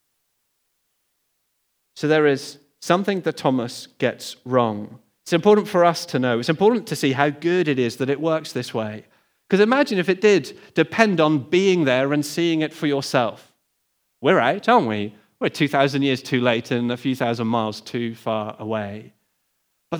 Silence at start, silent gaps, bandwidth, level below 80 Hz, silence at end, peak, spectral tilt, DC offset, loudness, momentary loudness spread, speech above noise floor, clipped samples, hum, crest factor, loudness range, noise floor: 1.95 s; none; over 20 kHz; -74 dBFS; 0 s; 0 dBFS; -5.5 dB/octave; under 0.1%; -21 LUFS; 11 LU; 51 dB; under 0.1%; none; 22 dB; 4 LU; -71 dBFS